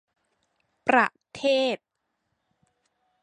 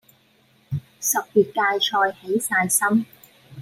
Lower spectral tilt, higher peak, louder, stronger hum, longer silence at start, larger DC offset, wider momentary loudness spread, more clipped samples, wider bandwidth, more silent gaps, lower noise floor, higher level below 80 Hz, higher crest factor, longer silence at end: about the same, -3.5 dB/octave vs -3 dB/octave; about the same, -4 dBFS vs -6 dBFS; second, -24 LUFS vs -21 LUFS; neither; first, 0.85 s vs 0.7 s; neither; second, 9 LU vs 14 LU; neither; second, 10.5 kHz vs 16 kHz; neither; first, -78 dBFS vs -59 dBFS; second, -74 dBFS vs -62 dBFS; first, 24 dB vs 18 dB; first, 1.45 s vs 0 s